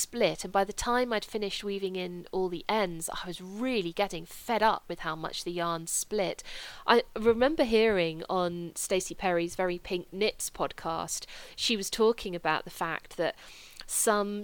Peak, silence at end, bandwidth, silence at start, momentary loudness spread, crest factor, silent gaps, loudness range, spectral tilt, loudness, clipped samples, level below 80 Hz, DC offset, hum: -8 dBFS; 0 s; 19 kHz; 0 s; 10 LU; 22 dB; none; 4 LU; -3 dB/octave; -30 LUFS; under 0.1%; -52 dBFS; under 0.1%; none